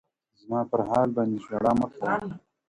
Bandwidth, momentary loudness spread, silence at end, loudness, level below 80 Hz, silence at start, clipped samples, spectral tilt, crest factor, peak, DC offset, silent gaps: 11 kHz; 7 LU; 0.3 s; -27 LUFS; -58 dBFS; 0.45 s; under 0.1%; -8 dB/octave; 18 dB; -10 dBFS; under 0.1%; none